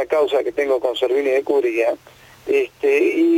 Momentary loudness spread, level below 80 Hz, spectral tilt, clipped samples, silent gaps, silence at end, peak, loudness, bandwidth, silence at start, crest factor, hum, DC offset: 5 LU; -62 dBFS; -4 dB/octave; under 0.1%; none; 0 s; -4 dBFS; -19 LUFS; 16 kHz; 0 s; 14 dB; none; under 0.1%